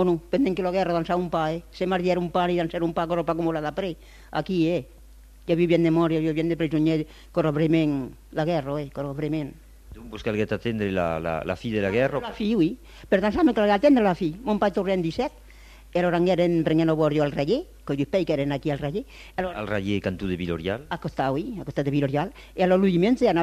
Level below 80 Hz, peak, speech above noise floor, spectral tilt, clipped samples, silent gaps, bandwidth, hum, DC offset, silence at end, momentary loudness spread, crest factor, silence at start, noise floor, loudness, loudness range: -48 dBFS; -8 dBFS; 24 dB; -7.5 dB/octave; under 0.1%; none; 14 kHz; none; under 0.1%; 0 s; 10 LU; 16 dB; 0 s; -48 dBFS; -25 LUFS; 5 LU